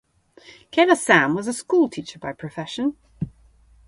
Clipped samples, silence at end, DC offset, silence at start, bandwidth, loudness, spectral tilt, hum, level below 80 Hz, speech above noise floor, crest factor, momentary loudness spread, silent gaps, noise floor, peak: under 0.1%; 0.6 s; under 0.1%; 0.75 s; 11.5 kHz; -20 LUFS; -4.5 dB/octave; none; -56 dBFS; 33 dB; 22 dB; 17 LU; none; -54 dBFS; 0 dBFS